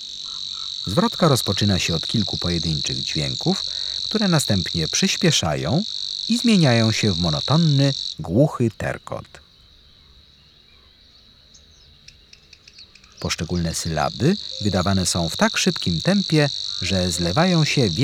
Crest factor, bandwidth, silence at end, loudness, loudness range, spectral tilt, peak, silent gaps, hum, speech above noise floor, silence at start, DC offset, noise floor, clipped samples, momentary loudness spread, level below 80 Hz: 20 dB; 16.5 kHz; 0 s; -20 LUFS; 9 LU; -4.5 dB/octave; -2 dBFS; none; none; 32 dB; 0 s; under 0.1%; -52 dBFS; under 0.1%; 8 LU; -46 dBFS